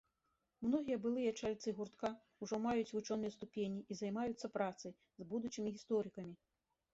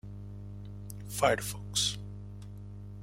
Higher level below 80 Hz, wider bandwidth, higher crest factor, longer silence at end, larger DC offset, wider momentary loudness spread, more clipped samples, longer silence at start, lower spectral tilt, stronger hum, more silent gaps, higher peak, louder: second, -76 dBFS vs -52 dBFS; second, 8 kHz vs 16 kHz; second, 18 dB vs 24 dB; first, 0.6 s vs 0 s; neither; second, 10 LU vs 17 LU; neither; first, 0.6 s vs 0.05 s; first, -5.5 dB/octave vs -3 dB/octave; second, none vs 50 Hz at -40 dBFS; neither; second, -24 dBFS vs -12 dBFS; second, -42 LUFS vs -31 LUFS